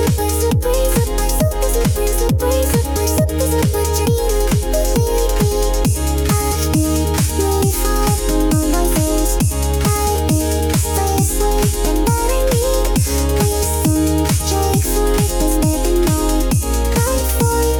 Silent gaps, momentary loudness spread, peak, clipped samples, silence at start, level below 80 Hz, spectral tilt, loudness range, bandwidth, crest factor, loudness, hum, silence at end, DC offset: none; 1 LU; -4 dBFS; under 0.1%; 0 s; -20 dBFS; -5 dB/octave; 1 LU; 19 kHz; 10 dB; -16 LUFS; none; 0 s; under 0.1%